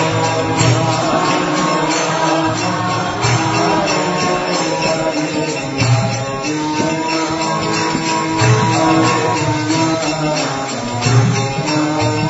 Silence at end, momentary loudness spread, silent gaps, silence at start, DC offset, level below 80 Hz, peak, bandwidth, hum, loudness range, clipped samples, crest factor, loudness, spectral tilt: 0 s; 5 LU; none; 0 s; under 0.1%; -44 dBFS; 0 dBFS; 8 kHz; none; 2 LU; under 0.1%; 14 dB; -15 LUFS; -4.5 dB/octave